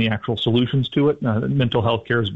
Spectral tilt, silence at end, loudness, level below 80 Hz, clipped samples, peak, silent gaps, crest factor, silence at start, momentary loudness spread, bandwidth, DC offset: -8.5 dB/octave; 0 s; -20 LUFS; -50 dBFS; under 0.1%; -8 dBFS; none; 12 dB; 0 s; 3 LU; 5.4 kHz; under 0.1%